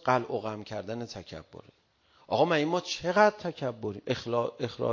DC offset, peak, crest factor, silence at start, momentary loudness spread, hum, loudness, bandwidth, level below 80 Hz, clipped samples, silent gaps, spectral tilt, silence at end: under 0.1%; -8 dBFS; 22 dB; 0.05 s; 14 LU; none; -30 LUFS; 7.4 kHz; -64 dBFS; under 0.1%; none; -5 dB/octave; 0 s